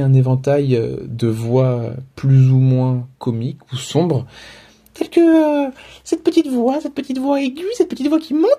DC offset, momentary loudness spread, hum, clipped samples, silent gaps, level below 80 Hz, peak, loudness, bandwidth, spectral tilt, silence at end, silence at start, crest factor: under 0.1%; 12 LU; none; under 0.1%; none; -50 dBFS; -2 dBFS; -17 LUFS; 11 kHz; -8 dB/octave; 0 s; 0 s; 14 dB